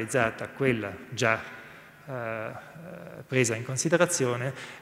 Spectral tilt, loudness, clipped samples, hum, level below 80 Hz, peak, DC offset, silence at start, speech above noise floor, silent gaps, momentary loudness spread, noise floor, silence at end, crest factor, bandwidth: -4.5 dB/octave; -28 LUFS; under 0.1%; none; -64 dBFS; -6 dBFS; under 0.1%; 0 s; 20 dB; none; 19 LU; -48 dBFS; 0 s; 22 dB; 16 kHz